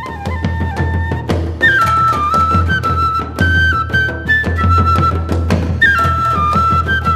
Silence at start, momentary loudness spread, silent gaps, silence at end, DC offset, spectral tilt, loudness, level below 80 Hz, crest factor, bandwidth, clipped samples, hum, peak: 0 s; 8 LU; none; 0 s; under 0.1%; -6 dB/octave; -13 LUFS; -24 dBFS; 12 dB; 13.5 kHz; under 0.1%; none; 0 dBFS